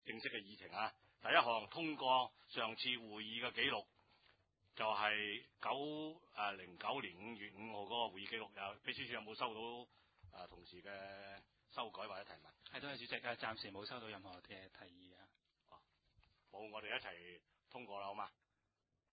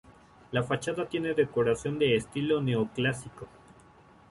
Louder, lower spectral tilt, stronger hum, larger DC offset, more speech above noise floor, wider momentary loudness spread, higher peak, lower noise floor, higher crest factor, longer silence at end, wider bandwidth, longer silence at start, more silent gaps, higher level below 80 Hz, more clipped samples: second, -44 LUFS vs -29 LUFS; second, 0 dB/octave vs -6 dB/octave; neither; neither; first, 43 dB vs 28 dB; first, 19 LU vs 11 LU; second, -16 dBFS vs -12 dBFS; first, -88 dBFS vs -56 dBFS; first, 30 dB vs 18 dB; about the same, 0.85 s vs 0.85 s; second, 4.9 kHz vs 11.5 kHz; about the same, 0.05 s vs 0.1 s; neither; second, -80 dBFS vs -60 dBFS; neither